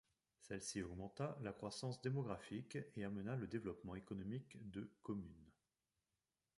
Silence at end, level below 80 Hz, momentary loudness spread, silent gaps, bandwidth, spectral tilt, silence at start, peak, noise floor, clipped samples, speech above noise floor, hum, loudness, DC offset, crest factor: 1.05 s; -70 dBFS; 8 LU; none; 11.5 kHz; -6 dB/octave; 0.4 s; -30 dBFS; under -90 dBFS; under 0.1%; over 42 dB; none; -49 LUFS; under 0.1%; 20 dB